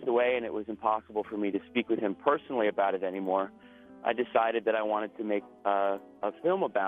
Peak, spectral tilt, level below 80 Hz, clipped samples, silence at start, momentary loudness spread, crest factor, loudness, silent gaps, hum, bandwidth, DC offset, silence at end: -10 dBFS; -8 dB/octave; -72 dBFS; under 0.1%; 0 s; 6 LU; 20 dB; -30 LUFS; none; none; 3.9 kHz; under 0.1%; 0 s